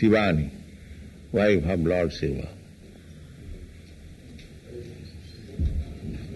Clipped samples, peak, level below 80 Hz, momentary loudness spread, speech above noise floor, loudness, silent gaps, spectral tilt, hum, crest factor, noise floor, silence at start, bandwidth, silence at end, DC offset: under 0.1%; -10 dBFS; -38 dBFS; 25 LU; 24 dB; -26 LUFS; none; -7.5 dB/octave; none; 18 dB; -47 dBFS; 0 s; 12 kHz; 0 s; under 0.1%